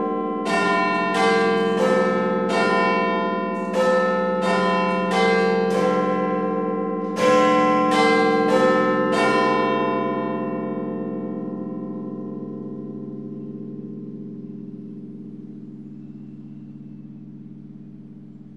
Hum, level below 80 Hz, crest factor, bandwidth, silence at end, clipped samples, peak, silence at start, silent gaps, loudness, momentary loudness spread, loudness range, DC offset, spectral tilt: none; -66 dBFS; 16 dB; 12 kHz; 0 s; under 0.1%; -6 dBFS; 0 s; none; -20 LUFS; 22 LU; 18 LU; 0.2%; -5.5 dB/octave